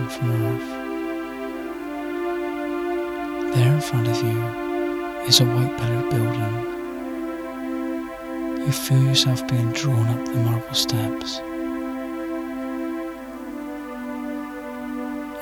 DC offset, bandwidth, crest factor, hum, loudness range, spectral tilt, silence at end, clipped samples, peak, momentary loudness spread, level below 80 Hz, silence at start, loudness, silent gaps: under 0.1%; 19 kHz; 24 dB; none; 9 LU; -5 dB/octave; 0 s; under 0.1%; 0 dBFS; 12 LU; -52 dBFS; 0 s; -24 LUFS; none